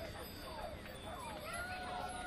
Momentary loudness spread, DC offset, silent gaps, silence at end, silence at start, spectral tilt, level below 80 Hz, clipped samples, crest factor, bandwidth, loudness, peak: 5 LU; under 0.1%; none; 0 s; 0 s; -4 dB/octave; -56 dBFS; under 0.1%; 14 dB; 15.5 kHz; -46 LUFS; -30 dBFS